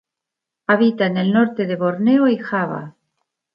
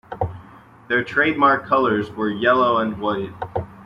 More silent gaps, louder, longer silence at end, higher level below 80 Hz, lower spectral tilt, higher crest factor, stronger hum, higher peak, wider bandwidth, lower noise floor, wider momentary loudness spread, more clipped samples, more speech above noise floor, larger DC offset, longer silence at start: neither; about the same, -18 LUFS vs -20 LUFS; first, 0.65 s vs 0 s; second, -68 dBFS vs -52 dBFS; first, -9.5 dB/octave vs -7.5 dB/octave; about the same, 16 dB vs 16 dB; neither; about the same, -2 dBFS vs -4 dBFS; second, 5.4 kHz vs 7.4 kHz; first, -84 dBFS vs -45 dBFS; second, 9 LU vs 12 LU; neither; first, 67 dB vs 26 dB; neither; first, 0.7 s vs 0.1 s